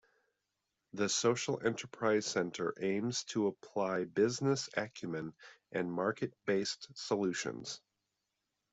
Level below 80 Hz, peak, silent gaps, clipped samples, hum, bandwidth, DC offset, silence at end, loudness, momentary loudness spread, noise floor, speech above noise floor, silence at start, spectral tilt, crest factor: -76 dBFS; -16 dBFS; none; under 0.1%; none; 8.2 kHz; under 0.1%; 0.95 s; -36 LUFS; 11 LU; -86 dBFS; 51 dB; 0.95 s; -4 dB/octave; 20 dB